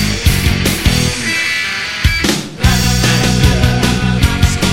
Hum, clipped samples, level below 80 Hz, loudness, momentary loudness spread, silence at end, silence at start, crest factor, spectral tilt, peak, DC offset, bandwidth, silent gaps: none; under 0.1%; -20 dBFS; -13 LUFS; 3 LU; 0 s; 0 s; 12 dB; -4 dB/octave; 0 dBFS; under 0.1%; 17 kHz; none